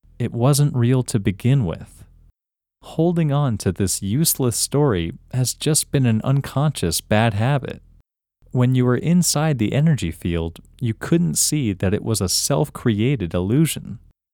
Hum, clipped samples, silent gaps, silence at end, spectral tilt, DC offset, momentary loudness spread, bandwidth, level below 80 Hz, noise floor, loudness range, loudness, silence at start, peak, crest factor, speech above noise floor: none; under 0.1%; none; 0.35 s; -5 dB/octave; under 0.1%; 9 LU; 18 kHz; -44 dBFS; -87 dBFS; 2 LU; -20 LUFS; 0.2 s; -2 dBFS; 18 dB; 67 dB